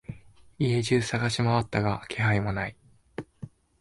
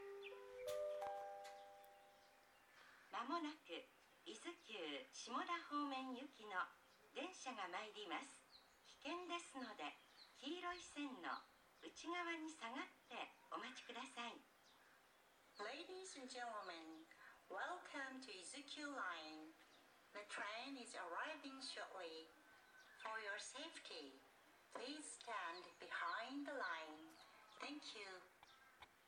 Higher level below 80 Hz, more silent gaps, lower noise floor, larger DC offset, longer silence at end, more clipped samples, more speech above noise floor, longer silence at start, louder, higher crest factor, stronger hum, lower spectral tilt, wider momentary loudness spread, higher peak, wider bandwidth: first, -52 dBFS vs under -90 dBFS; neither; second, -47 dBFS vs -73 dBFS; neither; first, 0.35 s vs 0 s; neither; about the same, 21 dB vs 21 dB; about the same, 0.1 s vs 0 s; first, -27 LUFS vs -52 LUFS; about the same, 18 dB vs 20 dB; neither; first, -6 dB/octave vs -1.5 dB/octave; about the same, 20 LU vs 18 LU; first, -12 dBFS vs -32 dBFS; second, 11.5 kHz vs 19 kHz